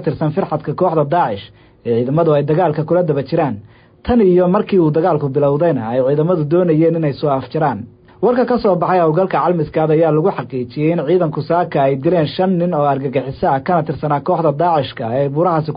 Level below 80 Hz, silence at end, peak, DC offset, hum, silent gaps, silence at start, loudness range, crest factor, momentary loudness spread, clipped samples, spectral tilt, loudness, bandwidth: -46 dBFS; 0 s; -4 dBFS; under 0.1%; none; none; 0 s; 2 LU; 12 dB; 5 LU; under 0.1%; -13 dB/octave; -15 LUFS; 5.2 kHz